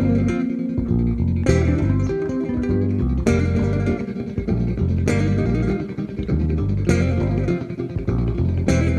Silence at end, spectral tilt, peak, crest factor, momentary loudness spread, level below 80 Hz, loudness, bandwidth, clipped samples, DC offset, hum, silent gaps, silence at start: 0 s; -8 dB/octave; -2 dBFS; 16 dB; 6 LU; -28 dBFS; -21 LUFS; 9.8 kHz; under 0.1%; under 0.1%; none; none; 0 s